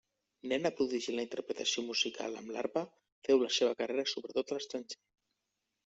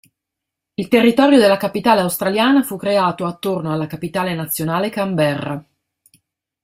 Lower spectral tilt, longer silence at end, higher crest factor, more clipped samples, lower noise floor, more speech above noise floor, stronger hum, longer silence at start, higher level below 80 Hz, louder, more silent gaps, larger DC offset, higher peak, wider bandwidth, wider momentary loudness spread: second, -2.5 dB/octave vs -5.5 dB/octave; second, 0.9 s vs 1.05 s; about the same, 20 dB vs 16 dB; neither; first, -86 dBFS vs -82 dBFS; second, 51 dB vs 66 dB; neither; second, 0.45 s vs 0.8 s; second, -80 dBFS vs -58 dBFS; second, -35 LUFS vs -17 LUFS; first, 3.12-3.22 s vs none; neither; second, -16 dBFS vs 0 dBFS; second, 8 kHz vs 16 kHz; about the same, 12 LU vs 11 LU